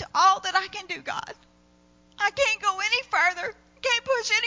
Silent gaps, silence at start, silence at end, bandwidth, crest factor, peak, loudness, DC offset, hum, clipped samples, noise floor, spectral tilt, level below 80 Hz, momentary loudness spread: none; 0 s; 0 s; 7.6 kHz; 18 dB; -8 dBFS; -24 LUFS; under 0.1%; 60 Hz at -65 dBFS; under 0.1%; -59 dBFS; 0 dB/octave; -62 dBFS; 13 LU